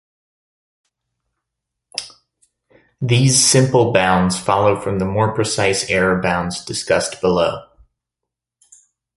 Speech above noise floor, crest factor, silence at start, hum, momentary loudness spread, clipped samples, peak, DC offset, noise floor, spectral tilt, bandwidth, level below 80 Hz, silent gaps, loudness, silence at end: 67 dB; 18 dB; 1.95 s; none; 14 LU; under 0.1%; -2 dBFS; under 0.1%; -83 dBFS; -4 dB/octave; 11.5 kHz; -46 dBFS; none; -16 LUFS; 1.55 s